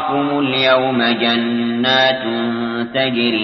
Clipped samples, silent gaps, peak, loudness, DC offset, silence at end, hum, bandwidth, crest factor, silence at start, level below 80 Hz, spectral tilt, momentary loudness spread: under 0.1%; none; -2 dBFS; -16 LUFS; under 0.1%; 0 s; none; 6.2 kHz; 14 dB; 0 s; -56 dBFS; -6 dB/octave; 6 LU